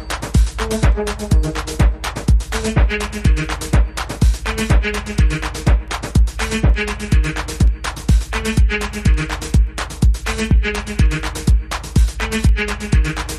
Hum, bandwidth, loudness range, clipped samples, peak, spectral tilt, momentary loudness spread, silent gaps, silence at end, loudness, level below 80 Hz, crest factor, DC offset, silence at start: none; 13.5 kHz; 1 LU; under 0.1%; -4 dBFS; -5.5 dB/octave; 3 LU; none; 0 s; -18 LUFS; -18 dBFS; 12 dB; under 0.1%; 0 s